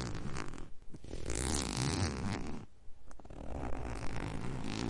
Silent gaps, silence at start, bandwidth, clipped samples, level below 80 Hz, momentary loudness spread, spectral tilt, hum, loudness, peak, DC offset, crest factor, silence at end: none; 0 s; 11.5 kHz; under 0.1%; -46 dBFS; 20 LU; -4.5 dB/octave; none; -39 LUFS; -16 dBFS; under 0.1%; 20 dB; 0 s